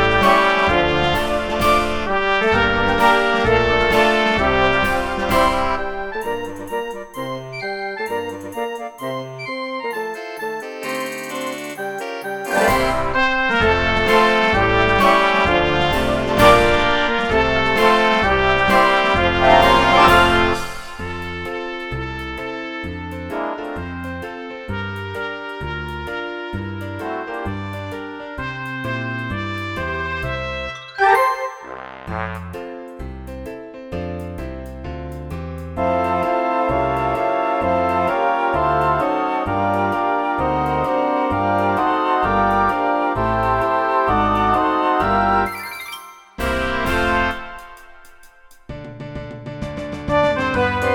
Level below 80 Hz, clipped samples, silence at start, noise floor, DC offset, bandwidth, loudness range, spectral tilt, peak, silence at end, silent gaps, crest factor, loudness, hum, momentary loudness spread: -34 dBFS; under 0.1%; 0 s; -45 dBFS; under 0.1%; 19.5 kHz; 12 LU; -5 dB/octave; 0 dBFS; 0 s; none; 18 dB; -18 LUFS; none; 16 LU